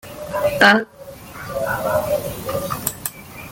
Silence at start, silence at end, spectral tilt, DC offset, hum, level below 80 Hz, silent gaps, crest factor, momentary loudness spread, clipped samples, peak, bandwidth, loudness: 0.05 s; 0 s; -3.5 dB/octave; under 0.1%; none; -46 dBFS; none; 20 dB; 21 LU; under 0.1%; 0 dBFS; 17 kHz; -19 LUFS